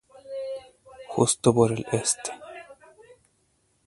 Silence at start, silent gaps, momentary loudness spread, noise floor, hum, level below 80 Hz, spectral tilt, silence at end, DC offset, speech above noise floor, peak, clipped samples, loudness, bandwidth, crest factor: 0.25 s; none; 22 LU; -69 dBFS; none; -60 dBFS; -4.5 dB/octave; 1.15 s; under 0.1%; 46 dB; -4 dBFS; under 0.1%; -25 LUFS; 12 kHz; 24 dB